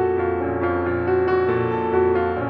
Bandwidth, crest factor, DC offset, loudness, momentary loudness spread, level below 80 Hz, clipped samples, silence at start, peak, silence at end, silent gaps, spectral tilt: 5.2 kHz; 12 dB; under 0.1%; -21 LUFS; 3 LU; -44 dBFS; under 0.1%; 0 s; -8 dBFS; 0 s; none; -10.5 dB/octave